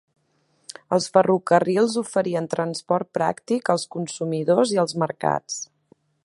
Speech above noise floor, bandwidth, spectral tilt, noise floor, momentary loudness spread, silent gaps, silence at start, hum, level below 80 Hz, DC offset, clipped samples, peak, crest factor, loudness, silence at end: 45 dB; 11.5 kHz; -5 dB/octave; -66 dBFS; 11 LU; none; 0.9 s; none; -68 dBFS; under 0.1%; under 0.1%; -2 dBFS; 22 dB; -22 LUFS; 0.6 s